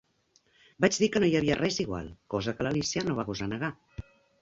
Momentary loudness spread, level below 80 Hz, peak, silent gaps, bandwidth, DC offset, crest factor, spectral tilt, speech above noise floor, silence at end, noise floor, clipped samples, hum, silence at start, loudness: 12 LU; -54 dBFS; -8 dBFS; none; 8 kHz; under 0.1%; 22 dB; -4.5 dB/octave; 40 dB; 0.4 s; -68 dBFS; under 0.1%; none; 0.8 s; -29 LUFS